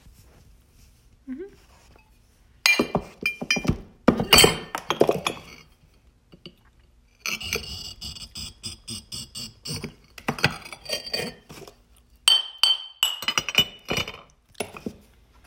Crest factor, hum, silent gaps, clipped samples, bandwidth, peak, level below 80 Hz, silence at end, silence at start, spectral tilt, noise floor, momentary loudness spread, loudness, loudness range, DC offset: 28 dB; none; none; under 0.1%; 16.5 kHz; 0 dBFS; -48 dBFS; 0.55 s; 0.05 s; -2.5 dB/octave; -58 dBFS; 20 LU; -23 LUFS; 12 LU; under 0.1%